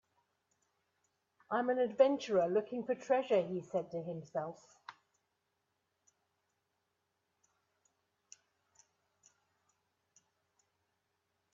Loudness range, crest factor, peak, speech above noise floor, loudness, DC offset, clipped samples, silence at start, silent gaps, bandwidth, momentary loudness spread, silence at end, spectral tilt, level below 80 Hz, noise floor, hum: 15 LU; 26 dB; -14 dBFS; 50 dB; -35 LUFS; under 0.1%; under 0.1%; 1.5 s; none; 7.6 kHz; 20 LU; 6.6 s; -6 dB/octave; -86 dBFS; -84 dBFS; none